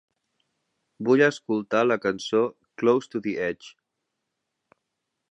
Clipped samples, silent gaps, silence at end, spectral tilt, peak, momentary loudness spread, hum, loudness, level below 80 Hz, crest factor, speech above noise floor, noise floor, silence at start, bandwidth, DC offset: under 0.1%; none; 1.65 s; -5.5 dB/octave; -6 dBFS; 10 LU; none; -24 LUFS; -70 dBFS; 20 dB; 58 dB; -81 dBFS; 1 s; 8.4 kHz; under 0.1%